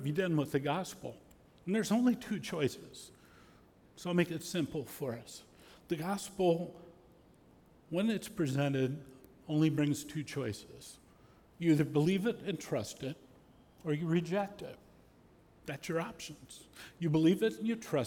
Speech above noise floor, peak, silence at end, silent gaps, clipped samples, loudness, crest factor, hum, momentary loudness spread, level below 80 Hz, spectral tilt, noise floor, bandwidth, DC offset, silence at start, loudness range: 29 dB; -18 dBFS; 0 s; none; under 0.1%; -34 LUFS; 18 dB; none; 20 LU; -68 dBFS; -6 dB/octave; -63 dBFS; 18.5 kHz; under 0.1%; 0 s; 5 LU